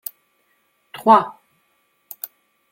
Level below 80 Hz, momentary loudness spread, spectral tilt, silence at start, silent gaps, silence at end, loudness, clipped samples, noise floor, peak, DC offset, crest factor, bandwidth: -74 dBFS; 25 LU; -5 dB/octave; 0.95 s; none; 1.45 s; -16 LUFS; under 0.1%; -65 dBFS; -2 dBFS; under 0.1%; 22 dB; 17 kHz